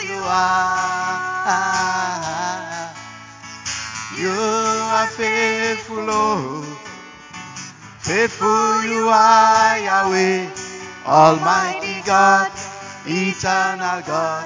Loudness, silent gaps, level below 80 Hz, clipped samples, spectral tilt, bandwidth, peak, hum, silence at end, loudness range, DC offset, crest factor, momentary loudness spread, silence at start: -17 LUFS; none; -54 dBFS; under 0.1%; -3.5 dB/octave; 7.6 kHz; 0 dBFS; none; 0 s; 7 LU; under 0.1%; 18 dB; 19 LU; 0 s